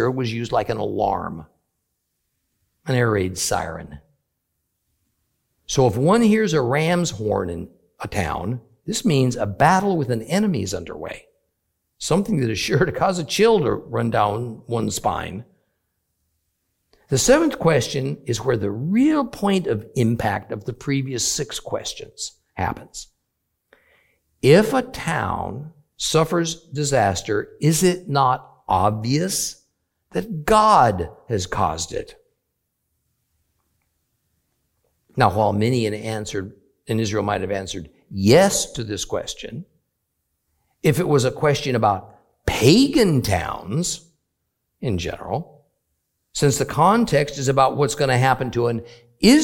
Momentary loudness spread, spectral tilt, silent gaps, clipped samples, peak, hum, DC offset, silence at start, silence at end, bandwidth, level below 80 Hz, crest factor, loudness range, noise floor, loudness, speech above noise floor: 15 LU; -5 dB/octave; none; under 0.1%; 0 dBFS; none; under 0.1%; 0 s; 0 s; 17 kHz; -46 dBFS; 22 dB; 7 LU; -76 dBFS; -20 LUFS; 56 dB